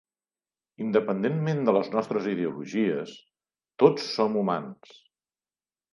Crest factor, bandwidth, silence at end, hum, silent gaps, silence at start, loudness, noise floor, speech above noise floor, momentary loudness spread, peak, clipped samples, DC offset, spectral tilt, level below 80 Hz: 24 dB; 11 kHz; 1.2 s; none; none; 0.8 s; -26 LUFS; under -90 dBFS; over 64 dB; 10 LU; -4 dBFS; under 0.1%; under 0.1%; -7 dB/octave; -78 dBFS